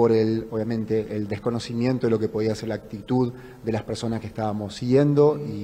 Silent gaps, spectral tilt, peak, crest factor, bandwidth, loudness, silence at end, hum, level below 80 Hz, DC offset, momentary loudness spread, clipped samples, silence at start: none; -7.5 dB/octave; -6 dBFS; 16 dB; 11 kHz; -24 LUFS; 0 s; none; -54 dBFS; under 0.1%; 10 LU; under 0.1%; 0 s